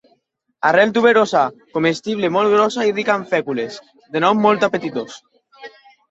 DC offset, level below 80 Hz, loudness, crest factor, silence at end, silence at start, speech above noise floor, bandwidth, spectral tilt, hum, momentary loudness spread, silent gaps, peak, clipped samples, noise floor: under 0.1%; -64 dBFS; -17 LUFS; 18 dB; 0.4 s; 0.65 s; 47 dB; 8 kHz; -5 dB/octave; none; 13 LU; none; 0 dBFS; under 0.1%; -64 dBFS